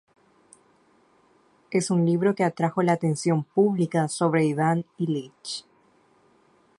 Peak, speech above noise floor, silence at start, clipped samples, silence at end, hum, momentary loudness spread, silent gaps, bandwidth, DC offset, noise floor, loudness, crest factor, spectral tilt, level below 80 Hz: -8 dBFS; 38 dB; 1.7 s; under 0.1%; 1.2 s; none; 9 LU; none; 11.5 kHz; under 0.1%; -61 dBFS; -24 LUFS; 18 dB; -6.5 dB/octave; -70 dBFS